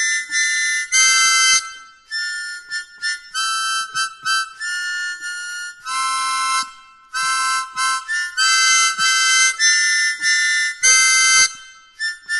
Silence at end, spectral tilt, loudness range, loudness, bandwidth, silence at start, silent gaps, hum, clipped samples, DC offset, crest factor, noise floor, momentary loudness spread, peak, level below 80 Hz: 0 s; 5 dB/octave; 9 LU; -16 LUFS; 11.5 kHz; 0 s; none; none; under 0.1%; under 0.1%; 16 dB; -41 dBFS; 15 LU; -2 dBFS; -62 dBFS